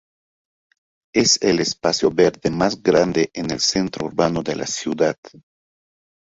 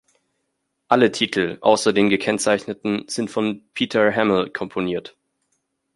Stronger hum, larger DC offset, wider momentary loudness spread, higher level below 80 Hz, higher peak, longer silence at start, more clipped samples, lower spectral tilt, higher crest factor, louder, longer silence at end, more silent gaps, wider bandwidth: neither; neither; about the same, 8 LU vs 9 LU; first, -52 dBFS vs -60 dBFS; about the same, -2 dBFS vs -2 dBFS; first, 1.15 s vs 0.9 s; neither; about the same, -3.5 dB/octave vs -4 dB/octave; about the same, 18 dB vs 20 dB; about the same, -19 LUFS vs -20 LUFS; about the same, 0.85 s vs 0.85 s; first, 5.18-5.23 s vs none; second, 8 kHz vs 11.5 kHz